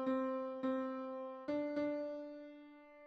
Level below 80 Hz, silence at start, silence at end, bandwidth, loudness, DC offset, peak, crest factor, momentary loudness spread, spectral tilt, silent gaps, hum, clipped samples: -82 dBFS; 0 s; 0 s; 6.2 kHz; -41 LUFS; under 0.1%; -28 dBFS; 14 dB; 15 LU; -7 dB/octave; none; none; under 0.1%